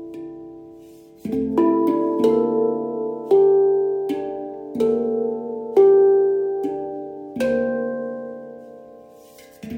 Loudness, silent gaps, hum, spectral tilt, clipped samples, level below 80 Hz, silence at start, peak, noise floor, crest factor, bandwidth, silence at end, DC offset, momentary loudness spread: -20 LUFS; none; none; -7.5 dB/octave; under 0.1%; -60 dBFS; 0 s; -4 dBFS; -46 dBFS; 16 dB; 6.2 kHz; 0 s; under 0.1%; 20 LU